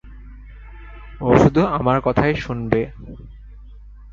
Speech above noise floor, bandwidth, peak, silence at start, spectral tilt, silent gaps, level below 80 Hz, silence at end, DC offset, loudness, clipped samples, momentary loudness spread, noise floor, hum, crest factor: 22 dB; 7.4 kHz; 0 dBFS; 0.05 s; -8 dB/octave; none; -36 dBFS; 0 s; under 0.1%; -18 LUFS; under 0.1%; 26 LU; -40 dBFS; 50 Hz at -35 dBFS; 20 dB